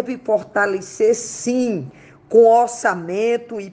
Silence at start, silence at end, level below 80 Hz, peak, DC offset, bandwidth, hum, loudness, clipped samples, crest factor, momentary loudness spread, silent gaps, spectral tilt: 0 s; 0 s; -64 dBFS; -2 dBFS; under 0.1%; 9.8 kHz; none; -18 LUFS; under 0.1%; 16 dB; 10 LU; none; -4.5 dB/octave